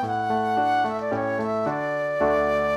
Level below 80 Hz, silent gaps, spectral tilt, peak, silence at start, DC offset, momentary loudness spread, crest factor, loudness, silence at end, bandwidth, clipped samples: -52 dBFS; none; -6.5 dB/octave; -10 dBFS; 0 s; under 0.1%; 4 LU; 14 dB; -24 LUFS; 0 s; 12.5 kHz; under 0.1%